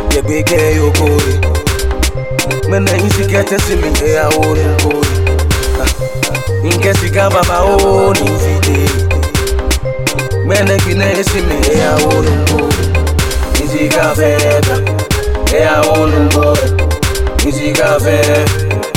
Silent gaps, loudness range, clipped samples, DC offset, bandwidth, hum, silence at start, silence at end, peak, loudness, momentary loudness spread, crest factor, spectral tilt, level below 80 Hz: none; 2 LU; under 0.1%; under 0.1%; 17 kHz; none; 0 s; 0 s; 0 dBFS; -12 LUFS; 5 LU; 10 dB; -5 dB/octave; -20 dBFS